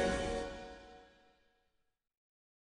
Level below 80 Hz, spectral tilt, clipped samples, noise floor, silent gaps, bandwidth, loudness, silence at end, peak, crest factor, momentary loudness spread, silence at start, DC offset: -54 dBFS; -4.5 dB/octave; under 0.1%; -81 dBFS; none; 10.5 kHz; -40 LUFS; 1.7 s; -22 dBFS; 20 dB; 22 LU; 0 s; under 0.1%